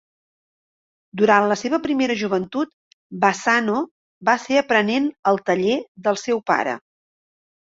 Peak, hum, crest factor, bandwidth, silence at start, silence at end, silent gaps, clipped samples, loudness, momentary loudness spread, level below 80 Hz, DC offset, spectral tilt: -2 dBFS; none; 20 dB; 8 kHz; 1.15 s; 0.85 s; 2.73-3.10 s, 3.91-4.21 s, 5.19-5.23 s, 5.88-5.95 s; under 0.1%; -20 LUFS; 10 LU; -64 dBFS; under 0.1%; -4.5 dB/octave